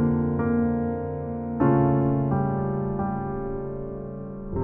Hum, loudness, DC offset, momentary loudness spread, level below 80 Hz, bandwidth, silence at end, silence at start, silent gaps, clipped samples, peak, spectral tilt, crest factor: none; -26 LUFS; under 0.1%; 13 LU; -44 dBFS; 3 kHz; 0 s; 0 s; none; under 0.1%; -8 dBFS; -13.5 dB/octave; 16 dB